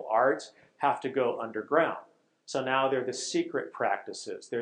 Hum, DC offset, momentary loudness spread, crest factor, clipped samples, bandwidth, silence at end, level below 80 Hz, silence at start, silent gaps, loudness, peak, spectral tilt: none; under 0.1%; 9 LU; 18 dB; under 0.1%; 10.5 kHz; 0 s; -88 dBFS; 0 s; none; -30 LUFS; -12 dBFS; -3.5 dB/octave